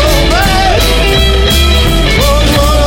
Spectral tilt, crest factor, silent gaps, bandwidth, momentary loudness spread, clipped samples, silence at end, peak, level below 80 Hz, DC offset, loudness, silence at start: -4 dB/octave; 8 dB; none; 17 kHz; 1 LU; under 0.1%; 0 s; 0 dBFS; -12 dBFS; under 0.1%; -8 LUFS; 0 s